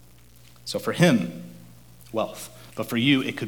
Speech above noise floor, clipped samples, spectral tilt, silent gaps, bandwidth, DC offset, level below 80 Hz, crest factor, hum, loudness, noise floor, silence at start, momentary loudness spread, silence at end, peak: 28 dB; under 0.1%; -5.5 dB/octave; none; 19.5 kHz; 0.2%; -58 dBFS; 22 dB; none; -24 LUFS; -52 dBFS; 0.65 s; 20 LU; 0 s; -4 dBFS